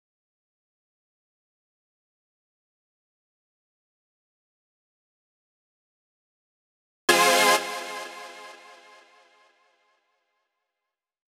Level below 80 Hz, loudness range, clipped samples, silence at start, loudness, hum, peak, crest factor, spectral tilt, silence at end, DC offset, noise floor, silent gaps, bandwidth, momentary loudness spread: under -90 dBFS; 15 LU; under 0.1%; 7.1 s; -21 LUFS; none; -4 dBFS; 28 dB; -0.5 dB/octave; 2.8 s; under 0.1%; -87 dBFS; none; over 20 kHz; 25 LU